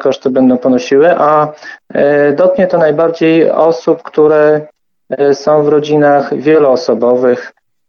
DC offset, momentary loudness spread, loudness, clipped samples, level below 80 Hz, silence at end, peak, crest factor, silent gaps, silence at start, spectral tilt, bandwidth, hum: under 0.1%; 6 LU; -10 LUFS; under 0.1%; -58 dBFS; 0.4 s; 0 dBFS; 10 dB; none; 0 s; -6.5 dB/octave; 6.8 kHz; none